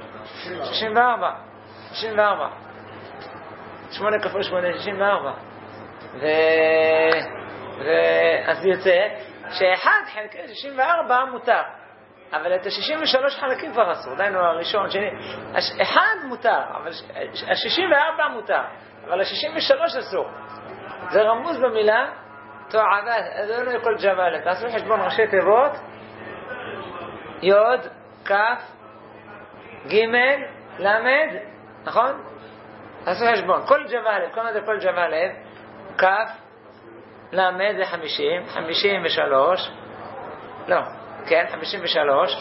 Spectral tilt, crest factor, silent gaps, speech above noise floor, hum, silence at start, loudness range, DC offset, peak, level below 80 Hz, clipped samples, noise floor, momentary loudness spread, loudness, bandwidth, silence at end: -7 dB/octave; 22 dB; none; 26 dB; none; 0 s; 4 LU; under 0.1%; 0 dBFS; -66 dBFS; under 0.1%; -47 dBFS; 20 LU; -21 LUFS; 6 kHz; 0 s